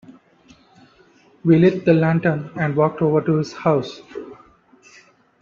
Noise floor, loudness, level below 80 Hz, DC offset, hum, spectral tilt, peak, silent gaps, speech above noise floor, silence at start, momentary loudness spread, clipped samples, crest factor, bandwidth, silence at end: -53 dBFS; -18 LUFS; -58 dBFS; under 0.1%; none; -8.5 dB/octave; -2 dBFS; none; 36 dB; 0.1 s; 20 LU; under 0.1%; 18 dB; 7 kHz; 1.1 s